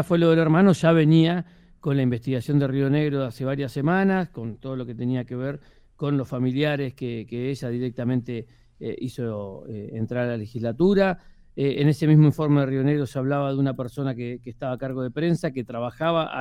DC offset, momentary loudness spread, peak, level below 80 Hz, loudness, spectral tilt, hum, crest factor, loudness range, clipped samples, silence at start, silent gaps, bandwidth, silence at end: under 0.1%; 15 LU; -6 dBFS; -54 dBFS; -24 LUFS; -8 dB/octave; none; 18 dB; 7 LU; under 0.1%; 0 s; none; 12 kHz; 0 s